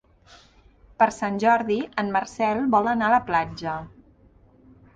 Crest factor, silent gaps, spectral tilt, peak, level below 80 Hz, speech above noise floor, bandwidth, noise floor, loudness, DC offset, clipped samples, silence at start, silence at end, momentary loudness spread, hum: 20 dB; none; -5.5 dB/octave; -4 dBFS; -56 dBFS; 33 dB; 9.4 kHz; -55 dBFS; -23 LUFS; under 0.1%; under 0.1%; 1 s; 1.1 s; 9 LU; none